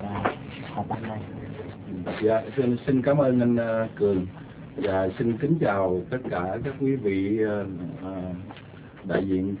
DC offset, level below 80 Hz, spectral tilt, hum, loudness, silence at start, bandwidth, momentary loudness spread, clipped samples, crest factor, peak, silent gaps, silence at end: under 0.1%; -50 dBFS; -11.5 dB/octave; none; -26 LUFS; 0 s; 4 kHz; 15 LU; under 0.1%; 18 dB; -8 dBFS; none; 0 s